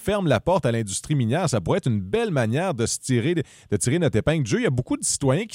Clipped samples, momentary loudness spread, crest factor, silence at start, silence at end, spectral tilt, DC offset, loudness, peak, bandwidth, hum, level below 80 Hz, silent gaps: under 0.1%; 4 LU; 16 dB; 0 s; 0 s; -5 dB/octave; under 0.1%; -23 LUFS; -8 dBFS; 16 kHz; none; -48 dBFS; none